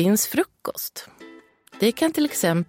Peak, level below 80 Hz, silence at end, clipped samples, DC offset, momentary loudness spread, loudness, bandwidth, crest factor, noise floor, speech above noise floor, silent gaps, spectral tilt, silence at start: -8 dBFS; -66 dBFS; 0.05 s; under 0.1%; under 0.1%; 13 LU; -23 LUFS; 16.5 kHz; 16 dB; -48 dBFS; 26 dB; none; -4.5 dB/octave; 0 s